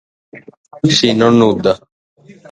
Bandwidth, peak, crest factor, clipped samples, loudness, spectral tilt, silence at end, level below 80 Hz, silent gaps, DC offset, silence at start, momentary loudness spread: 9.4 kHz; 0 dBFS; 16 dB; under 0.1%; -12 LUFS; -5 dB/octave; 0.2 s; -50 dBFS; 0.57-0.64 s, 1.92-2.16 s; under 0.1%; 0.35 s; 8 LU